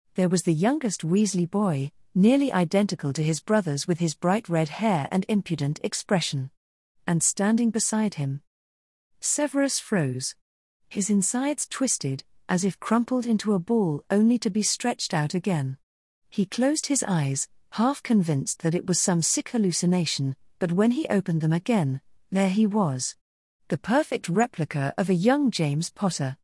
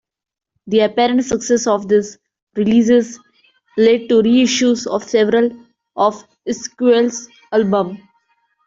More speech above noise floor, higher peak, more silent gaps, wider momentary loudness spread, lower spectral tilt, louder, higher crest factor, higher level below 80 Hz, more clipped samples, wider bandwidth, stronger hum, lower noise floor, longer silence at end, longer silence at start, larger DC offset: first, over 66 dB vs 48 dB; second, -8 dBFS vs -2 dBFS; first, 6.57-6.95 s, 8.47-9.11 s, 10.41-10.80 s, 15.83-16.22 s, 23.21-23.60 s vs 2.42-2.47 s; second, 8 LU vs 14 LU; about the same, -5 dB/octave vs -4.5 dB/octave; second, -25 LUFS vs -16 LUFS; about the same, 16 dB vs 14 dB; second, -68 dBFS vs -56 dBFS; neither; first, 12 kHz vs 7.8 kHz; neither; first, under -90 dBFS vs -63 dBFS; second, 0.1 s vs 0.7 s; second, 0.15 s vs 0.65 s; neither